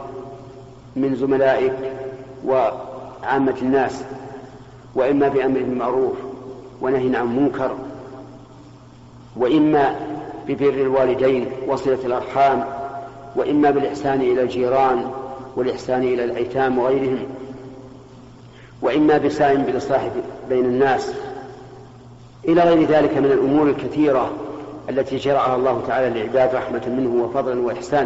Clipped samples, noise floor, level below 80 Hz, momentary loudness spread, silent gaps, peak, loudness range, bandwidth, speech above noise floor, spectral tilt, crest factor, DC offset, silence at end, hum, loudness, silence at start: under 0.1%; -43 dBFS; -52 dBFS; 17 LU; none; -6 dBFS; 4 LU; 8 kHz; 24 dB; -5.5 dB/octave; 14 dB; under 0.1%; 0 s; none; -19 LUFS; 0 s